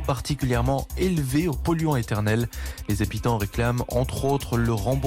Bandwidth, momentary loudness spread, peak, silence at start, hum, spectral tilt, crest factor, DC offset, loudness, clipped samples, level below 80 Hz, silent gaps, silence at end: 17 kHz; 3 LU; -12 dBFS; 0 s; none; -6 dB/octave; 12 dB; under 0.1%; -25 LUFS; under 0.1%; -34 dBFS; none; 0 s